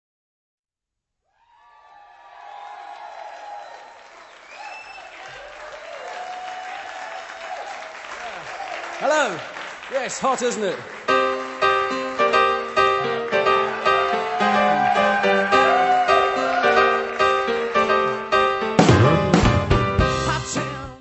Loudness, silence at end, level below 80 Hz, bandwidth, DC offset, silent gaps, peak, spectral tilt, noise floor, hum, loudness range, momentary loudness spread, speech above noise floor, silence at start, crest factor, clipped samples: -19 LUFS; 0 s; -40 dBFS; 8.4 kHz; under 0.1%; none; 0 dBFS; -5 dB/octave; -85 dBFS; none; 20 LU; 20 LU; 62 dB; 2.35 s; 22 dB; under 0.1%